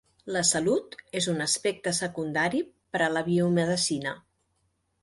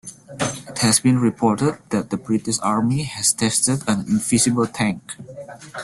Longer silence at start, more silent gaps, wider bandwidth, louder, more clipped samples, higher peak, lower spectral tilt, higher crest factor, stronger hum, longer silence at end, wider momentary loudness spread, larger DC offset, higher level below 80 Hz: first, 0.25 s vs 0.05 s; neither; about the same, 11.5 kHz vs 12.5 kHz; second, -27 LUFS vs -19 LUFS; neither; second, -10 dBFS vs -4 dBFS; about the same, -3.5 dB/octave vs -4 dB/octave; about the same, 18 dB vs 18 dB; neither; first, 0.85 s vs 0 s; second, 8 LU vs 17 LU; neither; second, -64 dBFS vs -54 dBFS